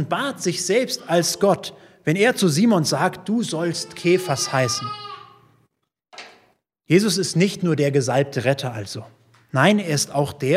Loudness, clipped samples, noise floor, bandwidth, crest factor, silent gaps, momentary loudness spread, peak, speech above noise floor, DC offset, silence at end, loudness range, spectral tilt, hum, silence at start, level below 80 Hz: -20 LUFS; under 0.1%; -70 dBFS; 16 kHz; 20 dB; none; 15 LU; 0 dBFS; 49 dB; under 0.1%; 0 s; 4 LU; -4.5 dB/octave; none; 0 s; -64 dBFS